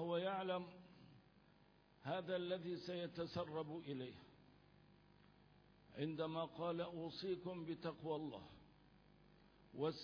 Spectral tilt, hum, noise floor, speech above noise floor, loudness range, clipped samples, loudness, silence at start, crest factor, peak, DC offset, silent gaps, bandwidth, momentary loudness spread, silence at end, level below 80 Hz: -5 dB/octave; none; -71 dBFS; 25 dB; 3 LU; under 0.1%; -47 LUFS; 0 s; 18 dB; -30 dBFS; under 0.1%; none; 5.4 kHz; 19 LU; 0 s; -78 dBFS